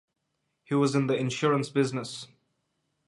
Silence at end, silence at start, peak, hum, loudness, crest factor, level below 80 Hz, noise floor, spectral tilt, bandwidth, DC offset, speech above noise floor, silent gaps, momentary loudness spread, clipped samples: 0.85 s; 0.7 s; -10 dBFS; none; -27 LUFS; 18 dB; -74 dBFS; -79 dBFS; -6 dB/octave; 11.5 kHz; under 0.1%; 52 dB; none; 14 LU; under 0.1%